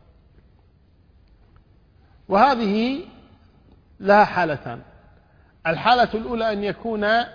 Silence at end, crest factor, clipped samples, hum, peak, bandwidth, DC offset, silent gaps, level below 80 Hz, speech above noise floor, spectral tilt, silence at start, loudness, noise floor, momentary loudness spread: 0 s; 20 dB; under 0.1%; none; -2 dBFS; 5.2 kHz; under 0.1%; none; -52 dBFS; 36 dB; -6.5 dB/octave; 2.3 s; -20 LUFS; -56 dBFS; 14 LU